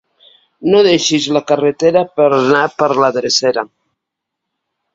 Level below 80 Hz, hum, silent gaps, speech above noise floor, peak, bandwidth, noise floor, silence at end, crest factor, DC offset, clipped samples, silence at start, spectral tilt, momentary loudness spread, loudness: -58 dBFS; none; none; 66 dB; 0 dBFS; 7.8 kHz; -78 dBFS; 1.3 s; 14 dB; under 0.1%; under 0.1%; 0.6 s; -4 dB/octave; 6 LU; -13 LUFS